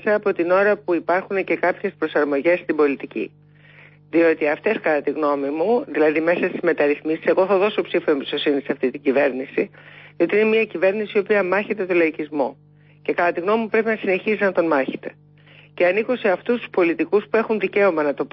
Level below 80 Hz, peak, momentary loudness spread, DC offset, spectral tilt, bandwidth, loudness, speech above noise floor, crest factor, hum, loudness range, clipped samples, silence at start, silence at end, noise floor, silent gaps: -70 dBFS; -6 dBFS; 7 LU; under 0.1%; -10.5 dB/octave; 5.8 kHz; -20 LUFS; 29 dB; 14 dB; 50 Hz at -50 dBFS; 2 LU; under 0.1%; 0.05 s; 0.05 s; -49 dBFS; none